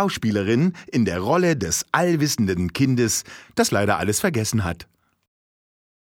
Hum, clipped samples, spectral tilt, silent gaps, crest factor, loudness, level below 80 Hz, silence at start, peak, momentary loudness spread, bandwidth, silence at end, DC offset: none; under 0.1%; -4.5 dB/octave; none; 20 dB; -21 LUFS; -48 dBFS; 0 s; -2 dBFS; 4 LU; 18 kHz; 1.2 s; under 0.1%